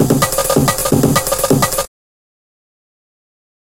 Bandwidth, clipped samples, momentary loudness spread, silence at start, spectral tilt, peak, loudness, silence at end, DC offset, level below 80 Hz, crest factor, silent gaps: 17.5 kHz; under 0.1%; 4 LU; 0 s; -4.5 dB/octave; 0 dBFS; -14 LUFS; 1.9 s; 1%; -36 dBFS; 16 dB; none